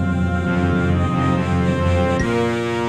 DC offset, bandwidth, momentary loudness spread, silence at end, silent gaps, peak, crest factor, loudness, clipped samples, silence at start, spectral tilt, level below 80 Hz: under 0.1%; 10 kHz; 2 LU; 0 s; none; -6 dBFS; 12 dB; -19 LUFS; under 0.1%; 0 s; -7.5 dB/octave; -38 dBFS